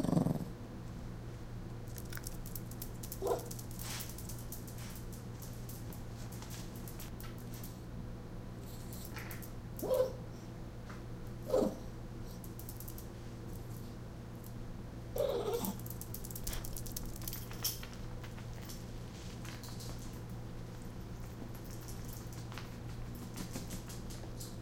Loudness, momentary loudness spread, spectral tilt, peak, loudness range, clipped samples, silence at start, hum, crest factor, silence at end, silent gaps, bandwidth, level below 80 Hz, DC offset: -43 LUFS; 11 LU; -5.5 dB/octave; -16 dBFS; 7 LU; under 0.1%; 0 s; none; 24 dB; 0 s; none; 17 kHz; -50 dBFS; under 0.1%